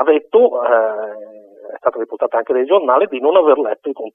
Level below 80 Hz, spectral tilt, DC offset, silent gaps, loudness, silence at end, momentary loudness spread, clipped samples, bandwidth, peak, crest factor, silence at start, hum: -68 dBFS; -7.5 dB/octave; under 0.1%; none; -15 LUFS; 0.05 s; 13 LU; under 0.1%; 3.7 kHz; 0 dBFS; 16 dB; 0 s; none